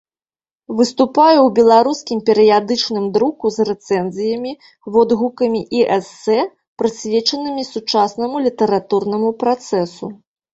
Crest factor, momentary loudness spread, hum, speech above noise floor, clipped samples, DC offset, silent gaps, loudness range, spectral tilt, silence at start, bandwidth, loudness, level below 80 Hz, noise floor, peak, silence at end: 14 dB; 11 LU; none; over 74 dB; under 0.1%; under 0.1%; 6.67-6.76 s; 4 LU; -5 dB/octave; 0.7 s; 8 kHz; -16 LUFS; -58 dBFS; under -90 dBFS; -2 dBFS; 0.4 s